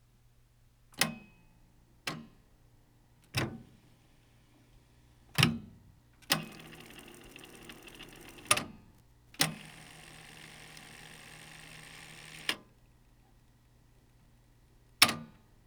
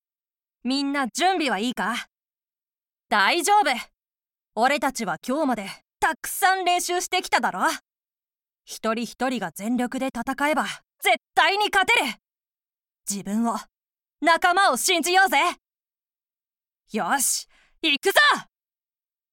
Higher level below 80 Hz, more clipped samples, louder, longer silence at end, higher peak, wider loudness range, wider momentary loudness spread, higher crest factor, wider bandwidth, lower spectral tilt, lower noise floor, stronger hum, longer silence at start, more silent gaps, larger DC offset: about the same, -64 dBFS vs -62 dBFS; neither; second, -32 LUFS vs -22 LUFS; second, 0.4 s vs 0.9 s; about the same, -4 dBFS vs -4 dBFS; first, 9 LU vs 4 LU; first, 22 LU vs 12 LU; first, 36 dB vs 20 dB; first, over 20 kHz vs 17 kHz; about the same, -2.5 dB/octave vs -1.5 dB/octave; second, -64 dBFS vs under -90 dBFS; neither; first, 0.95 s vs 0.65 s; neither; neither